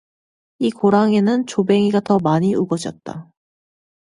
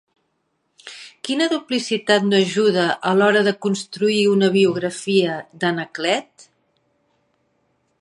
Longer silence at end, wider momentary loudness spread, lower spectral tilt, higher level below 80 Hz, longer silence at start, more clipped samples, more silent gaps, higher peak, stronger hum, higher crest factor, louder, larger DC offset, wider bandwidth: second, 0.8 s vs 1.8 s; first, 15 LU vs 9 LU; first, -7 dB/octave vs -4.5 dB/octave; first, -60 dBFS vs -70 dBFS; second, 0.6 s vs 0.85 s; neither; neither; about the same, -2 dBFS vs -2 dBFS; neither; about the same, 16 dB vs 18 dB; about the same, -17 LUFS vs -19 LUFS; neither; about the same, 11 kHz vs 11.5 kHz